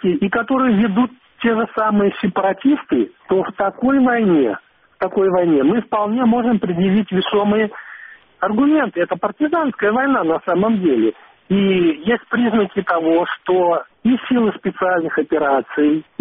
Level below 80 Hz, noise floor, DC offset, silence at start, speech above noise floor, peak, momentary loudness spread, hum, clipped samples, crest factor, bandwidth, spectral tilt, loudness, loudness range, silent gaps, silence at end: -54 dBFS; -40 dBFS; under 0.1%; 0.05 s; 23 dB; -4 dBFS; 6 LU; none; under 0.1%; 12 dB; 3.9 kHz; -5 dB/octave; -17 LUFS; 1 LU; none; 0.2 s